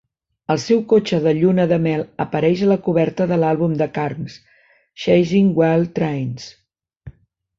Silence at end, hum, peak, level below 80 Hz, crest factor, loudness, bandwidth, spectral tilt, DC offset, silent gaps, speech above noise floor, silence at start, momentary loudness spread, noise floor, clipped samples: 0.5 s; none; -4 dBFS; -54 dBFS; 16 dB; -18 LUFS; 7.6 kHz; -7.5 dB/octave; under 0.1%; none; 29 dB; 0.5 s; 11 LU; -46 dBFS; under 0.1%